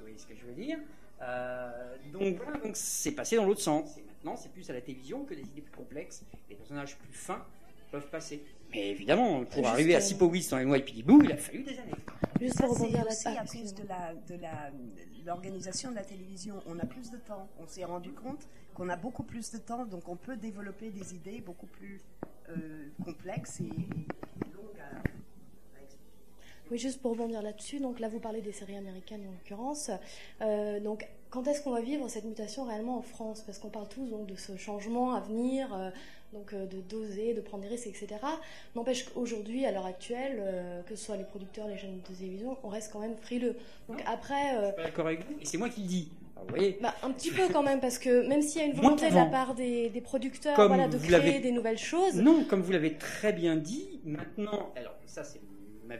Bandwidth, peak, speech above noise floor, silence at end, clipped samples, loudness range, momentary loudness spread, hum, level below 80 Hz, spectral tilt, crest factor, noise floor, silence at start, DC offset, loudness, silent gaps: 15 kHz; -8 dBFS; 28 dB; 0 s; under 0.1%; 16 LU; 19 LU; none; -60 dBFS; -5 dB/octave; 24 dB; -60 dBFS; 0 s; 0.4%; -32 LUFS; none